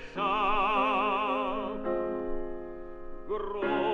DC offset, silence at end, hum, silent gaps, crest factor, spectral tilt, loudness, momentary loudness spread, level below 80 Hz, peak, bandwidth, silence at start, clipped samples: under 0.1%; 0 s; none; none; 16 dB; -6 dB/octave; -30 LUFS; 16 LU; -44 dBFS; -14 dBFS; 6.6 kHz; 0 s; under 0.1%